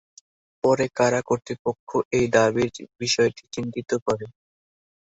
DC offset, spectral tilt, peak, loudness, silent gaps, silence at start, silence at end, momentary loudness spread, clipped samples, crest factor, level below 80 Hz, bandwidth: under 0.1%; -4.5 dB/octave; -6 dBFS; -24 LUFS; 1.59-1.65 s, 1.80-1.87 s, 2.05-2.11 s, 4.02-4.06 s; 0.65 s; 0.75 s; 10 LU; under 0.1%; 20 dB; -58 dBFS; 8.2 kHz